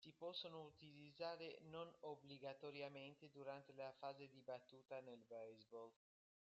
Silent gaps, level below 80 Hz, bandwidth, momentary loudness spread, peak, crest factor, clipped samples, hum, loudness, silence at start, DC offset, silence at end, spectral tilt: none; under -90 dBFS; 7.6 kHz; 8 LU; -38 dBFS; 18 dB; under 0.1%; none; -57 LUFS; 0 s; under 0.1%; 0.6 s; -3 dB/octave